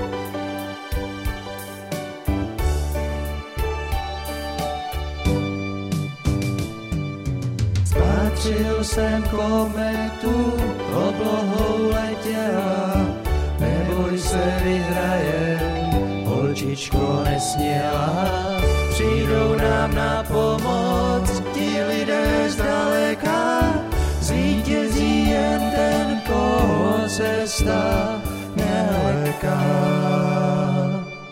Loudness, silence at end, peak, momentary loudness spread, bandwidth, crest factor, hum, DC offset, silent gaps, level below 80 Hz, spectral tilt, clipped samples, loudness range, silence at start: -22 LUFS; 0 s; -4 dBFS; 8 LU; 16.5 kHz; 16 dB; none; under 0.1%; none; -28 dBFS; -6 dB/octave; under 0.1%; 6 LU; 0 s